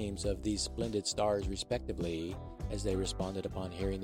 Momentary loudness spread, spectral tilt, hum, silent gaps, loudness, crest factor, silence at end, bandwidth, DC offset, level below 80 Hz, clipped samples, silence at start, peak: 7 LU; -5 dB/octave; none; none; -36 LUFS; 16 dB; 0 s; 16 kHz; under 0.1%; -44 dBFS; under 0.1%; 0 s; -18 dBFS